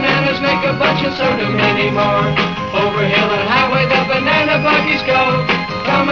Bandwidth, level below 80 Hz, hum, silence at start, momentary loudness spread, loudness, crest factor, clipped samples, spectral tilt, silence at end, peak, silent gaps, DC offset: 7.4 kHz; -40 dBFS; none; 0 s; 4 LU; -14 LUFS; 12 dB; under 0.1%; -6 dB/octave; 0 s; -2 dBFS; none; 0.3%